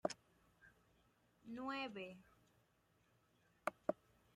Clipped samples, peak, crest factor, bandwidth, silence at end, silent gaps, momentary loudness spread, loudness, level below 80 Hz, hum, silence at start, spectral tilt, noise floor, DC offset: under 0.1%; -24 dBFS; 28 dB; 15 kHz; 0.4 s; none; 19 LU; -48 LUFS; -82 dBFS; none; 0.05 s; -4 dB/octave; -78 dBFS; under 0.1%